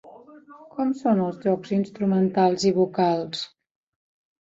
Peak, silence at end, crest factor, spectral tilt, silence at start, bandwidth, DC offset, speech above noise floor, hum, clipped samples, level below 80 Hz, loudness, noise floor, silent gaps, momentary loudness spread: -8 dBFS; 0.95 s; 16 dB; -6.5 dB/octave; 0.05 s; 7.8 kHz; under 0.1%; 25 dB; none; under 0.1%; -66 dBFS; -23 LUFS; -47 dBFS; none; 11 LU